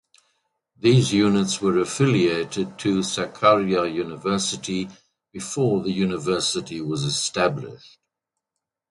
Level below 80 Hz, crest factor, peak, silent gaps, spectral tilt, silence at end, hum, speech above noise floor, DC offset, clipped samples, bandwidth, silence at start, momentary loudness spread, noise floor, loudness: -56 dBFS; 20 dB; -4 dBFS; none; -5 dB/octave; 1.15 s; none; 62 dB; under 0.1%; under 0.1%; 11.5 kHz; 0.85 s; 10 LU; -84 dBFS; -22 LUFS